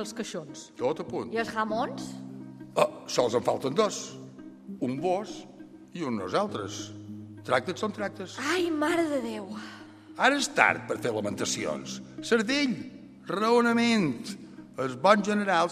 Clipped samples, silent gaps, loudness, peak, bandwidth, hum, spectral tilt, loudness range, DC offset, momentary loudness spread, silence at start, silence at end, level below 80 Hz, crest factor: under 0.1%; none; -28 LUFS; -4 dBFS; 15 kHz; none; -4 dB/octave; 5 LU; under 0.1%; 20 LU; 0 s; 0 s; -70 dBFS; 26 dB